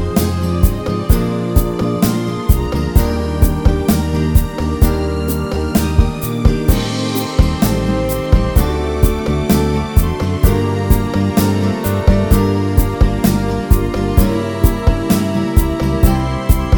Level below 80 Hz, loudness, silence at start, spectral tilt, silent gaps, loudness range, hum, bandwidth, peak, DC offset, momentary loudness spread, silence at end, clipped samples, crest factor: -18 dBFS; -16 LUFS; 0 s; -6.5 dB/octave; none; 1 LU; none; 20 kHz; 0 dBFS; under 0.1%; 3 LU; 0 s; 0.4%; 14 dB